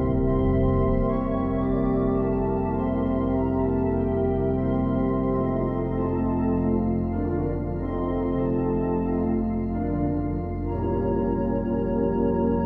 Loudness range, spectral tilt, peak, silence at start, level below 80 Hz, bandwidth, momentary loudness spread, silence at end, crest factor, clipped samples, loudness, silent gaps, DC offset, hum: 2 LU; -12 dB/octave; -12 dBFS; 0 s; -34 dBFS; 3.7 kHz; 4 LU; 0 s; 12 dB; under 0.1%; -25 LUFS; none; under 0.1%; none